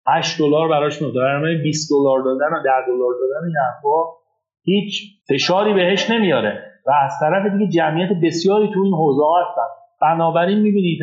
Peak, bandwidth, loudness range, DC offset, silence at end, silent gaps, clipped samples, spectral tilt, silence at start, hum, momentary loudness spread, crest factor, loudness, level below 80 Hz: -4 dBFS; 8 kHz; 2 LU; under 0.1%; 0 s; none; under 0.1%; -5.5 dB/octave; 0.05 s; none; 6 LU; 14 dB; -17 LUFS; -74 dBFS